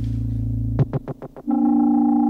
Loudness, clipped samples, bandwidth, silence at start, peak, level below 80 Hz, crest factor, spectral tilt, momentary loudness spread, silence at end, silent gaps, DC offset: -21 LUFS; under 0.1%; 3.8 kHz; 0 s; -8 dBFS; -34 dBFS; 12 dB; -11.5 dB/octave; 12 LU; 0 s; none; under 0.1%